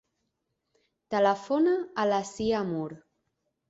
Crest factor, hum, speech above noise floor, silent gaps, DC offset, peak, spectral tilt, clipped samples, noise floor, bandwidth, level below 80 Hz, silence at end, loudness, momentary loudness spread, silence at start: 18 dB; none; 53 dB; none; under 0.1%; -12 dBFS; -5.5 dB/octave; under 0.1%; -80 dBFS; 8 kHz; -64 dBFS; 0.7 s; -28 LUFS; 8 LU; 1.1 s